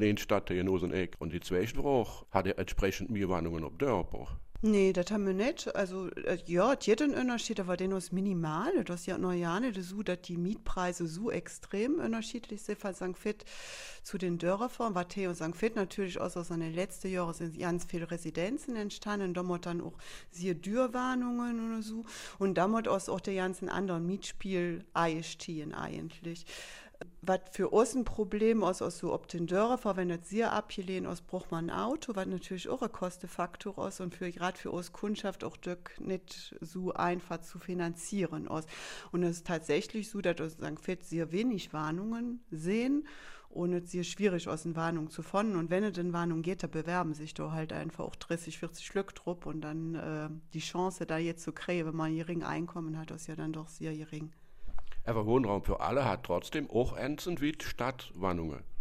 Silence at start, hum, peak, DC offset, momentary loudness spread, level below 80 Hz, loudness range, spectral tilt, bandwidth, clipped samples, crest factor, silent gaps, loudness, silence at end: 0 s; none; -12 dBFS; under 0.1%; 10 LU; -50 dBFS; 6 LU; -5.5 dB/octave; 15.5 kHz; under 0.1%; 24 dB; none; -35 LUFS; 0 s